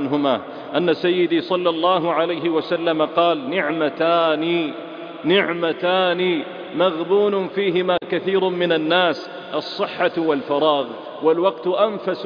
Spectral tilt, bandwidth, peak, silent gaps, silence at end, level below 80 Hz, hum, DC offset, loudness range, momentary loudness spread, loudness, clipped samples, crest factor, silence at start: -7 dB/octave; 5.2 kHz; -4 dBFS; none; 0 s; -66 dBFS; none; under 0.1%; 1 LU; 7 LU; -20 LUFS; under 0.1%; 16 dB; 0 s